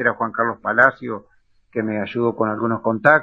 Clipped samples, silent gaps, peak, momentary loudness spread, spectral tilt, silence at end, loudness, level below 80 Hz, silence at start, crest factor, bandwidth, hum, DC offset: under 0.1%; none; 0 dBFS; 15 LU; -8.5 dB/octave; 0 s; -20 LUFS; -62 dBFS; 0 s; 20 dB; 7.4 kHz; none; under 0.1%